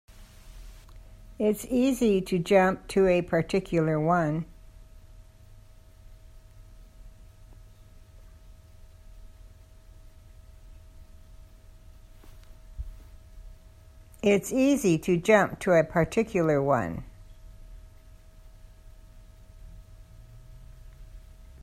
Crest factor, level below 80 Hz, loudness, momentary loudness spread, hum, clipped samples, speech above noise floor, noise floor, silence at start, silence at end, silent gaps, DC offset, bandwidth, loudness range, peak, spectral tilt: 22 dB; -48 dBFS; -25 LUFS; 14 LU; none; under 0.1%; 27 dB; -51 dBFS; 0.2 s; 0.2 s; none; under 0.1%; 16 kHz; 9 LU; -6 dBFS; -6 dB/octave